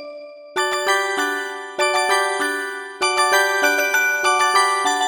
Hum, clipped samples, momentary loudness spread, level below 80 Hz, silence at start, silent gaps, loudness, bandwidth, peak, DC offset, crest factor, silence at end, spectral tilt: none; under 0.1%; 11 LU; -68 dBFS; 0 s; none; -18 LUFS; 19.5 kHz; -4 dBFS; under 0.1%; 16 dB; 0 s; 0.5 dB/octave